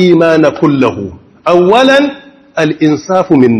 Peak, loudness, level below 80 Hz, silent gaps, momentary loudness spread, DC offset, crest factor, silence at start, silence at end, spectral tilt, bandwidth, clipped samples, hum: 0 dBFS; -9 LUFS; -50 dBFS; none; 12 LU; under 0.1%; 8 dB; 0 s; 0 s; -6.5 dB/octave; 12 kHz; 2%; none